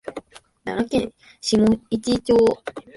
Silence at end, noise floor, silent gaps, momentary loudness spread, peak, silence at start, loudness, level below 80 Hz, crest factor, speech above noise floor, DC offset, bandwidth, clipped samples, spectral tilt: 0.15 s; -40 dBFS; none; 17 LU; -6 dBFS; 0.05 s; -21 LUFS; -48 dBFS; 14 dB; 20 dB; under 0.1%; 11.5 kHz; under 0.1%; -5.5 dB/octave